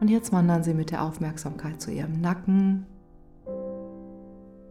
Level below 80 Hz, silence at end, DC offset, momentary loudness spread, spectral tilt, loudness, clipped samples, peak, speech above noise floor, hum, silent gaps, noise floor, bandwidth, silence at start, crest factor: -54 dBFS; 0 s; under 0.1%; 22 LU; -7.5 dB/octave; -27 LUFS; under 0.1%; -12 dBFS; 26 dB; none; none; -51 dBFS; 14.5 kHz; 0 s; 14 dB